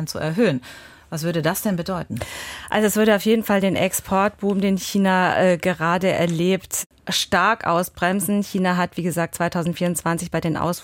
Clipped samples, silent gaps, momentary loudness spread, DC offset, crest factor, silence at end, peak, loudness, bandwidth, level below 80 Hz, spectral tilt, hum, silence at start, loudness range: under 0.1%; 6.86-6.90 s; 9 LU; under 0.1%; 16 dB; 0 s; -6 dBFS; -21 LUFS; 17 kHz; -50 dBFS; -4.5 dB/octave; none; 0 s; 3 LU